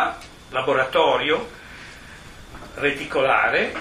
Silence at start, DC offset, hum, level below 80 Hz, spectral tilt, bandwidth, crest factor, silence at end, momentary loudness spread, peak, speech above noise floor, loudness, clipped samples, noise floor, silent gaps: 0 s; under 0.1%; none; -48 dBFS; -4 dB/octave; 15 kHz; 18 dB; 0 s; 23 LU; -4 dBFS; 21 dB; -21 LUFS; under 0.1%; -41 dBFS; none